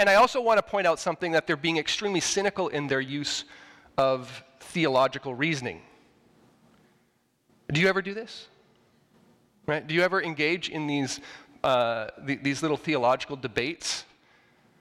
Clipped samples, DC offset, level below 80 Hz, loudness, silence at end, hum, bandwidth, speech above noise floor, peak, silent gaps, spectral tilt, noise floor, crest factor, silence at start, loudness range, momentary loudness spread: under 0.1%; under 0.1%; -62 dBFS; -27 LUFS; 0.8 s; none; 16 kHz; 43 dB; -12 dBFS; none; -4 dB/octave; -69 dBFS; 16 dB; 0 s; 5 LU; 13 LU